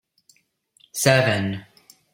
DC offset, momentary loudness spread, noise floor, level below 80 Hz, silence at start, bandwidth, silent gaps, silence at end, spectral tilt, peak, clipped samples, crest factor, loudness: under 0.1%; 17 LU; -63 dBFS; -60 dBFS; 0.95 s; 16.5 kHz; none; 0.5 s; -4 dB/octave; -2 dBFS; under 0.1%; 22 dB; -20 LUFS